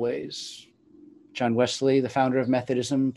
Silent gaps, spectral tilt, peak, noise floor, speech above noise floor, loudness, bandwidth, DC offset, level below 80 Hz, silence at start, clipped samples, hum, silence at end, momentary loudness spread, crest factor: none; -5.5 dB/octave; -8 dBFS; -53 dBFS; 28 dB; -25 LUFS; 11.5 kHz; under 0.1%; -68 dBFS; 0 s; under 0.1%; none; 0 s; 15 LU; 16 dB